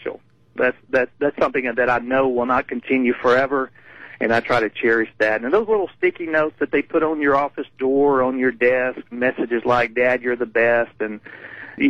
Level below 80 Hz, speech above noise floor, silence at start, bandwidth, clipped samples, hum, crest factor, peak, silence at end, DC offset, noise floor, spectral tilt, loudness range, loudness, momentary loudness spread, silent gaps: -54 dBFS; 19 dB; 0 s; 8 kHz; under 0.1%; none; 16 dB; -4 dBFS; 0 s; 0.3%; -39 dBFS; -6.5 dB/octave; 1 LU; -20 LUFS; 8 LU; none